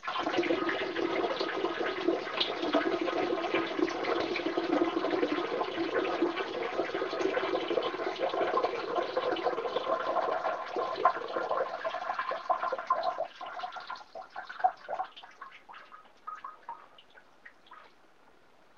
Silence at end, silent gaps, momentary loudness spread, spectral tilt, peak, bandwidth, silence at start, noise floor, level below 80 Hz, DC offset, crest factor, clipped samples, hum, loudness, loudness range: 0.9 s; none; 14 LU; -4.5 dB/octave; -12 dBFS; 7.2 kHz; 0 s; -62 dBFS; -72 dBFS; under 0.1%; 22 dB; under 0.1%; none; -32 LUFS; 9 LU